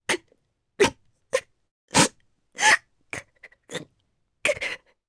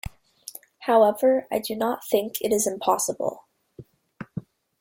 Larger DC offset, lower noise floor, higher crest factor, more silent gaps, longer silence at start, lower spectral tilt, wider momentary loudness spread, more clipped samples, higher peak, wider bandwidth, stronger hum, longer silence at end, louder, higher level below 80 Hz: neither; first, -71 dBFS vs -49 dBFS; about the same, 24 dB vs 20 dB; first, 1.71-1.88 s vs none; about the same, 0.1 s vs 0.05 s; second, -2 dB/octave vs -3.5 dB/octave; about the same, 19 LU vs 21 LU; neither; about the same, -4 dBFS vs -6 dBFS; second, 11 kHz vs 16.5 kHz; neither; about the same, 0.3 s vs 0.4 s; about the same, -23 LUFS vs -23 LUFS; about the same, -58 dBFS vs -56 dBFS